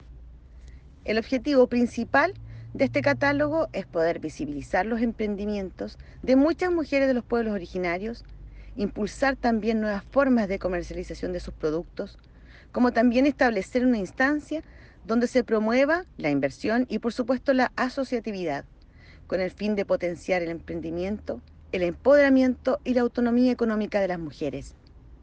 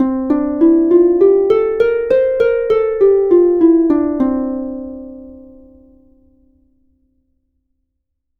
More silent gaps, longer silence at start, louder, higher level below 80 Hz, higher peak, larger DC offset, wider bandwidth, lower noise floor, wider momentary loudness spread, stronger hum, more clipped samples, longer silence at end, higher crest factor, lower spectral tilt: neither; about the same, 0.05 s vs 0 s; second, -25 LUFS vs -13 LUFS; about the same, -48 dBFS vs -44 dBFS; second, -8 dBFS vs 0 dBFS; neither; first, 8.8 kHz vs 4.5 kHz; second, -50 dBFS vs -72 dBFS; about the same, 12 LU vs 13 LU; neither; neither; second, 0.1 s vs 3 s; about the same, 16 dB vs 14 dB; second, -6.5 dB/octave vs -8.5 dB/octave